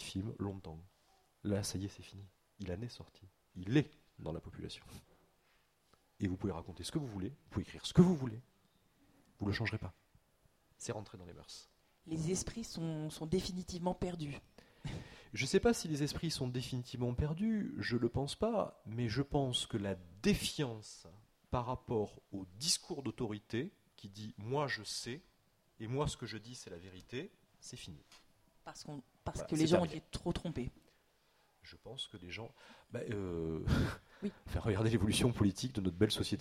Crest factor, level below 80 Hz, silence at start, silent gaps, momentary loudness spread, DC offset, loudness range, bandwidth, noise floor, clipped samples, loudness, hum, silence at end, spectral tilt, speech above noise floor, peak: 26 dB; -56 dBFS; 0 s; none; 18 LU; under 0.1%; 8 LU; 16 kHz; -74 dBFS; under 0.1%; -38 LUFS; none; 0 s; -5.5 dB/octave; 36 dB; -14 dBFS